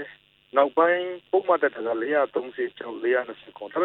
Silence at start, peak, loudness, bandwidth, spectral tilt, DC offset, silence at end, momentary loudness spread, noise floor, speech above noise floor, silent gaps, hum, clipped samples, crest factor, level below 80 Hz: 0 s; -6 dBFS; -25 LUFS; 4.1 kHz; -7.5 dB/octave; under 0.1%; 0 s; 11 LU; -49 dBFS; 25 dB; none; none; under 0.1%; 20 dB; -76 dBFS